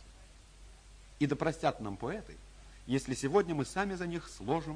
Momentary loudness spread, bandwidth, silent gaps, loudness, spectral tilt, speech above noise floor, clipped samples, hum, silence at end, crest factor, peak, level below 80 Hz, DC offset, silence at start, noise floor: 12 LU; 10.5 kHz; none; -35 LUFS; -5.5 dB/octave; 22 dB; under 0.1%; none; 0 s; 22 dB; -14 dBFS; -54 dBFS; under 0.1%; 0 s; -56 dBFS